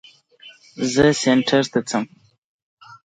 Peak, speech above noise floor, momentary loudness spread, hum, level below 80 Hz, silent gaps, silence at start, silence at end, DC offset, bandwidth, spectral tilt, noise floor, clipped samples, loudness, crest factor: -2 dBFS; 29 dB; 14 LU; none; -52 dBFS; 2.38-2.77 s; 0.45 s; 0.15 s; under 0.1%; 9.4 kHz; -4.5 dB/octave; -48 dBFS; under 0.1%; -19 LUFS; 18 dB